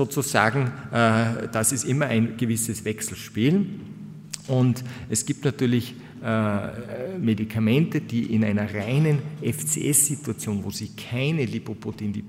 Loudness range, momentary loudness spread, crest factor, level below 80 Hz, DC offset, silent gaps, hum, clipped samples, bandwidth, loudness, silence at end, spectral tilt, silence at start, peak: 3 LU; 12 LU; 22 dB; -58 dBFS; under 0.1%; none; none; under 0.1%; 16 kHz; -24 LUFS; 0 s; -5 dB/octave; 0 s; -2 dBFS